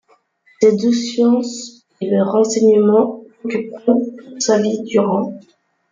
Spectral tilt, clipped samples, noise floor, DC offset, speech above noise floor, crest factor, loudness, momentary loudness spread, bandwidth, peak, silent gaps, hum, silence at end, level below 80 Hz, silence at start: -5.5 dB/octave; under 0.1%; -55 dBFS; under 0.1%; 40 dB; 16 dB; -16 LUFS; 15 LU; 9.4 kHz; 0 dBFS; none; none; 0.5 s; -64 dBFS; 0.6 s